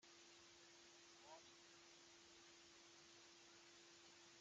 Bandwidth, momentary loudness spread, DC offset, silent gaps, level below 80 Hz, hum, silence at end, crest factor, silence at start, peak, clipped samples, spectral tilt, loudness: 8.8 kHz; 2 LU; under 0.1%; none; under -90 dBFS; none; 0 s; 18 dB; 0 s; -50 dBFS; under 0.1%; -1 dB/octave; -65 LUFS